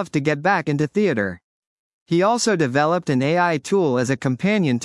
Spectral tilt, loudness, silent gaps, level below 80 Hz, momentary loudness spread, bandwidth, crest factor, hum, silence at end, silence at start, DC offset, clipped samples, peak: -5.5 dB/octave; -20 LUFS; 1.43-2.06 s; -66 dBFS; 4 LU; 12 kHz; 14 dB; none; 0 s; 0 s; under 0.1%; under 0.1%; -6 dBFS